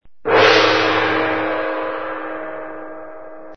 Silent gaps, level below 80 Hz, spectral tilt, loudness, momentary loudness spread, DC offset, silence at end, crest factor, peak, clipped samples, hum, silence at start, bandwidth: none; -54 dBFS; -4 dB/octave; -16 LUFS; 22 LU; 1%; 0 s; 18 dB; 0 dBFS; under 0.1%; none; 0 s; 6.6 kHz